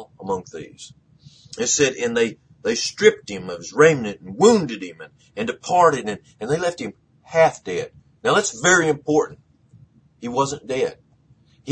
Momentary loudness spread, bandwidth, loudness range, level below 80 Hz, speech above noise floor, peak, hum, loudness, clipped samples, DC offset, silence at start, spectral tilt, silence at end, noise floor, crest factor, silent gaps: 17 LU; 10 kHz; 3 LU; -58 dBFS; 36 dB; 0 dBFS; none; -20 LUFS; under 0.1%; under 0.1%; 0 s; -3.5 dB/octave; 0 s; -56 dBFS; 22 dB; none